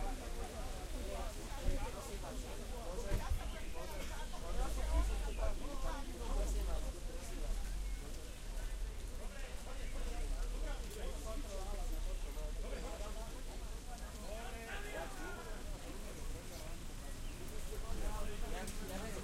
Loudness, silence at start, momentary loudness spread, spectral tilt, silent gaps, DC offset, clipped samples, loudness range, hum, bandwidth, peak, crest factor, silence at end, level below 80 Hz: -46 LUFS; 0 s; 7 LU; -4.5 dB/octave; none; under 0.1%; under 0.1%; 5 LU; none; 16 kHz; -22 dBFS; 18 dB; 0 s; -42 dBFS